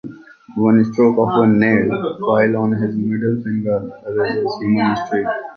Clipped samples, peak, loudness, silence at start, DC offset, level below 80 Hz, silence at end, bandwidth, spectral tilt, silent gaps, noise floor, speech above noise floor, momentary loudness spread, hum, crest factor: under 0.1%; -2 dBFS; -17 LUFS; 0.05 s; under 0.1%; -54 dBFS; 0 s; 6.4 kHz; -8.5 dB/octave; none; -37 dBFS; 21 dB; 8 LU; none; 14 dB